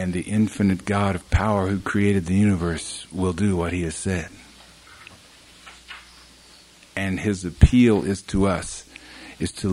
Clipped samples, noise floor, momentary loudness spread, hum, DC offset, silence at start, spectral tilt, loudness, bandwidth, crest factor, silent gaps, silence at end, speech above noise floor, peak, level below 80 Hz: under 0.1%; -50 dBFS; 21 LU; none; under 0.1%; 0 s; -6.5 dB/octave; -22 LUFS; 12 kHz; 22 dB; none; 0 s; 29 dB; 0 dBFS; -34 dBFS